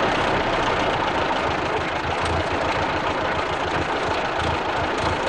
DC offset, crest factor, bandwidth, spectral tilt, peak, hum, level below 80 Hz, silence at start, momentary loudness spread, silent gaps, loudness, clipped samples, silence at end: 0.2%; 14 dB; 11 kHz; -4.5 dB/octave; -8 dBFS; none; -38 dBFS; 0 s; 2 LU; none; -22 LUFS; under 0.1%; 0 s